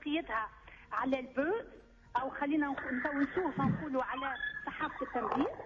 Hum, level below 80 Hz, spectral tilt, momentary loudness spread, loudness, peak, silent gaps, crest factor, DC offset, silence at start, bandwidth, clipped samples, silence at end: none; -60 dBFS; -7.5 dB/octave; 6 LU; -35 LUFS; -22 dBFS; none; 14 dB; under 0.1%; 0 s; 7.2 kHz; under 0.1%; 0 s